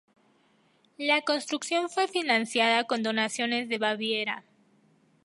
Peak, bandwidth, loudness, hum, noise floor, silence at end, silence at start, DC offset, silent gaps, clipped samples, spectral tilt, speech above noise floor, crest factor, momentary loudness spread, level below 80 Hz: -10 dBFS; 11.5 kHz; -27 LUFS; none; -66 dBFS; 0.85 s; 1 s; under 0.1%; none; under 0.1%; -2.5 dB/octave; 38 dB; 20 dB; 6 LU; -84 dBFS